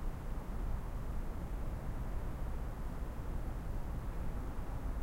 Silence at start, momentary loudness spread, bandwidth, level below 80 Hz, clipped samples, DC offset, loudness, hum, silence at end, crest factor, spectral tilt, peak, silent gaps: 0 s; 1 LU; 16 kHz; -40 dBFS; under 0.1%; under 0.1%; -44 LUFS; none; 0 s; 12 dB; -7.5 dB/octave; -28 dBFS; none